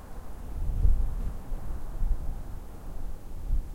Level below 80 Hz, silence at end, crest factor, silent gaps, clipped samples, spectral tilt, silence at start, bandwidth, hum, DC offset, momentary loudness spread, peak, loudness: -30 dBFS; 0 s; 18 dB; none; under 0.1%; -7.5 dB/octave; 0 s; 3.1 kHz; none; under 0.1%; 15 LU; -10 dBFS; -36 LUFS